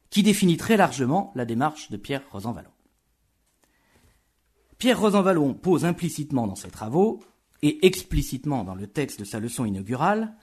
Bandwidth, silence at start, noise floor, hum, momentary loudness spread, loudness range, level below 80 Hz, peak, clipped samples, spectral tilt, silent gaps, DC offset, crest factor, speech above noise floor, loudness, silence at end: 13.5 kHz; 0.1 s; -69 dBFS; none; 12 LU; 8 LU; -44 dBFS; -4 dBFS; under 0.1%; -5.5 dB/octave; none; under 0.1%; 22 dB; 46 dB; -24 LUFS; 0.1 s